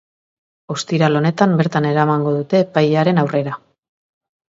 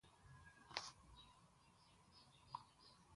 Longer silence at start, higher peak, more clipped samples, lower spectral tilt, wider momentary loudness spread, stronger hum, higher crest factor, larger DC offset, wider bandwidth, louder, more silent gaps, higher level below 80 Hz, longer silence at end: first, 0.7 s vs 0.05 s; first, 0 dBFS vs -24 dBFS; neither; first, -7 dB/octave vs -2 dB/octave; second, 10 LU vs 16 LU; neither; second, 16 dB vs 36 dB; neither; second, 7.8 kHz vs 11.5 kHz; first, -16 LUFS vs -57 LUFS; neither; first, -62 dBFS vs -76 dBFS; first, 0.9 s vs 0 s